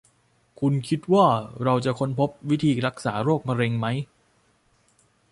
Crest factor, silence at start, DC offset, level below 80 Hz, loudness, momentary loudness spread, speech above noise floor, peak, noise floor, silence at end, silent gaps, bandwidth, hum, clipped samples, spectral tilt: 20 dB; 0.6 s; under 0.1%; -60 dBFS; -24 LUFS; 8 LU; 41 dB; -6 dBFS; -64 dBFS; 1.25 s; none; 11.5 kHz; none; under 0.1%; -7 dB/octave